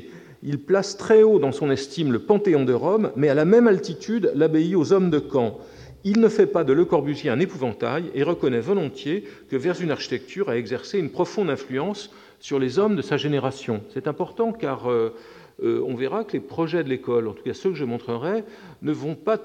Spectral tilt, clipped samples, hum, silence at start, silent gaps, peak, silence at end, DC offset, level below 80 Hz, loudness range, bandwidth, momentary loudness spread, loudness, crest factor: -7 dB/octave; under 0.1%; none; 0 s; none; -4 dBFS; 0 s; under 0.1%; -62 dBFS; 7 LU; 9.4 kHz; 11 LU; -23 LUFS; 18 dB